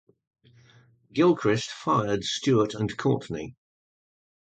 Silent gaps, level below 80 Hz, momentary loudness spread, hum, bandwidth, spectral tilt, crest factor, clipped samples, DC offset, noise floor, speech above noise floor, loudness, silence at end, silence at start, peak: none; -60 dBFS; 12 LU; none; 9.2 kHz; -5.5 dB/octave; 16 dB; under 0.1%; under 0.1%; -58 dBFS; 33 dB; -26 LUFS; 0.9 s; 1.15 s; -10 dBFS